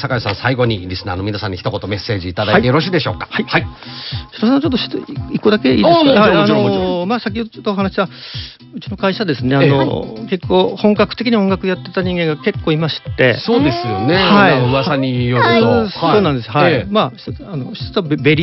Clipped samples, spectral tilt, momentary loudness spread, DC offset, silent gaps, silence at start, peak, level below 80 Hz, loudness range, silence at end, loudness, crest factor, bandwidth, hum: under 0.1%; -4.5 dB/octave; 12 LU; under 0.1%; none; 0 s; 0 dBFS; -40 dBFS; 4 LU; 0 s; -15 LUFS; 14 dB; 6 kHz; none